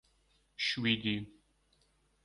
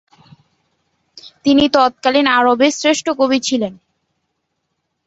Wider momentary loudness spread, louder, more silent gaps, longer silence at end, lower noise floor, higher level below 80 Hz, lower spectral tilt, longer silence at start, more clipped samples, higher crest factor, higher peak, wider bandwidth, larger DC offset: first, 21 LU vs 8 LU; second, -33 LUFS vs -14 LUFS; neither; second, 0.95 s vs 1.35 s; about the same, -72 dBFS vs -72 dBFS; second, -68 dBFS vs -54 dBFS; first, -4.5 dB/octave vs -3 dB/octave; second, 0.6 s vs 1.25 s; neither; first, 24 dB vs 16 dB; second, -14 dBFS vs -2 dBFS; first, 11 kHz vs 8 kHz; neither